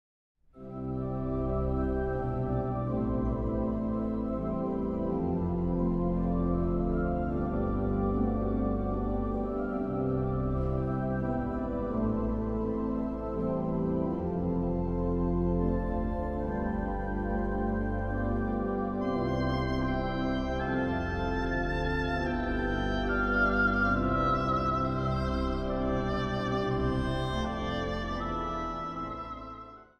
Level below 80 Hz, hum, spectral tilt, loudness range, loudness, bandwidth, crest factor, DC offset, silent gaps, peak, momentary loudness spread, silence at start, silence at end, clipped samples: -38 dBFS; none; -8.5 dB/octave; 3 LU; -31 LUFS; 6.8 kHz; 14 dB; under 0.1%; none; -16 dBFS; 5 LU; 0.55 s; 0.15 s; under 0.1%